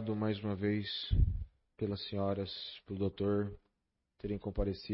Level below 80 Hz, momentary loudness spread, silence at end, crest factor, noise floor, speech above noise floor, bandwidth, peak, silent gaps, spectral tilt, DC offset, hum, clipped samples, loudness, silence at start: -44 dBFS; 10 LU; 0 s; 18 dB; -84 dBFS; 49 dB; 5.6 kHz; -18 dBFS; none; -6 dB/octave; under 0.1%; none; under 0.1%; -37 LUFS; 0 s